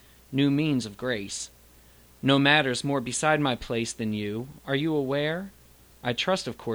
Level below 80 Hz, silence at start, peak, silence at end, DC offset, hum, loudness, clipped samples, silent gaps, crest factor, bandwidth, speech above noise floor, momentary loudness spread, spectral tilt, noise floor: -56 dBFS; 0.3 s; -6 dBFS; 0 s; under 0.1%; none; -26 LUFS; under 0.1%; none; 22 dB; over 20 kHz; 28 dB; 13 LU; -4.5 dB/octave; -55 dBFS